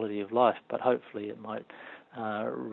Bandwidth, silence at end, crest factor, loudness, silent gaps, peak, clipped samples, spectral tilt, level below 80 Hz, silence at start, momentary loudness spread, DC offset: 4.2 kHz; 0 s; 22 dB; -31 LUFS; none; -10 dBFS; under 0.1%; -9 dB/octave; -82 dBFS; 0 s; 18 LU; under 0.1%